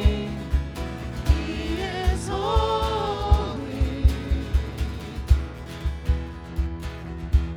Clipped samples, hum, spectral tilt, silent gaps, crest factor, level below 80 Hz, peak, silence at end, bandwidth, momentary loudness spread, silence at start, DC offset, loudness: under 0.1%; none; -6.5 dB/octave; none; 20 dB; -26 dBFS; -4 dBFS; 0 s; 12.5 kHz; 9 LU; 0 s; under 0.1%; -26 LUFS